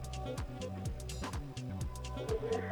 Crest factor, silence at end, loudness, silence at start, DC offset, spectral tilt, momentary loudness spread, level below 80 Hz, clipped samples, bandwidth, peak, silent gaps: 16 dB; 0 s; -41 LUFS; 0 s; under 0.1%; -5.5 dB/octave; 6 LU; -46 dBFS; under 0.1%; 19.5 kHz; -24 dBFS; none